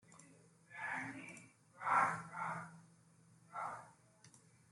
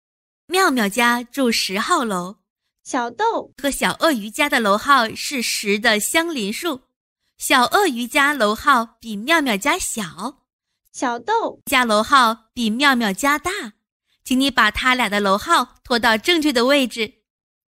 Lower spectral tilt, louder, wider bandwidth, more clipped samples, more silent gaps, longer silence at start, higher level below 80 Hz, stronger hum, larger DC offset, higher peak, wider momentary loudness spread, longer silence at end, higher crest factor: first, -4.5 dB/octave vs -2.5 dB/octave; second, -41 LUFS vs -18 LUFS; second, 12 kHz vs 16 kHz; neither; second, none vs 2.50-2.56 s, 6.96-7.16 s, 10.53-10.59 s, 13.92-14.00 s; second, 0.1 s vs 0.5 s; second, -86 dBFS vs -50 dBFS; neither; neither; second, -20 dBFS vs -2 dBFS; first, 27 LU vs 11 LU; second, 0.35 s vs 0.7 s; first, 24 dB vs 18 dB